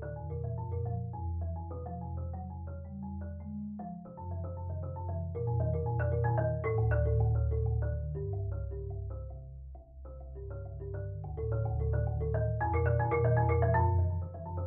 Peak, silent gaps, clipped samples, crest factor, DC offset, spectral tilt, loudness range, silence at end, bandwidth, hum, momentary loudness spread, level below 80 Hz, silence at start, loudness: -16 dBFS; none; under 0.1%; 16 dB; under 0.1%; -11 dB/octave; 10 LU; 0 s; 2.9 kHz; none; 14 LU; -42 dBFS; 0 s; -34 LUFS